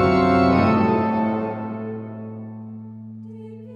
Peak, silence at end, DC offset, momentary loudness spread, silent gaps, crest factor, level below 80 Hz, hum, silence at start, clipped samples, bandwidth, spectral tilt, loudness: -4 dBFS; 0 s; under 0.1%; 21 LU; none; 16 dB; -52 dBFS; none; 0 s; under 0.1%; 7 kHz; -8.5 dB/octave; -20 LUFS